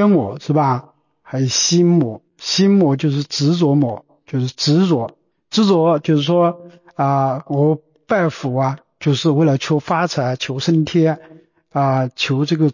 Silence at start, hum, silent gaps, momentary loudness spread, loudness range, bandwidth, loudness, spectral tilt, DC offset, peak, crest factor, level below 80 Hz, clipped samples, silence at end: 0 s; none; none; 9 LU; 2 LU; 7.4 kHz; -17 LUFS; -5.5 dB/octave; under 0.1%; -4 dBFS; 12 dB; -58 dBFS; under 0.1%; 0 s